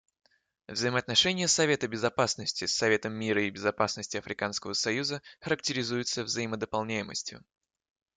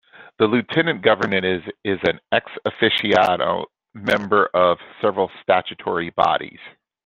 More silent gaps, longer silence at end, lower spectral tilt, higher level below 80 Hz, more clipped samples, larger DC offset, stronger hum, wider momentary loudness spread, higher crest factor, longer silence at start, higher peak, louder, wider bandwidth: neither; first, 0.8 s vs 0.35 s; second, -3 dB/octave vs -6 dB/octave; second, -66 dBFS vs -60 dBFS; neither; neither; neither; about the same, 10 LU vs 9 LU; about the same, 22 dB vs 20 dB; first, 0.7 s vs 0.2 s; second, -10 dBFS vs 0 dBFS; second, -29 LUFS vs -20 LUFS; first, 11 kHz vs 9.4 kHz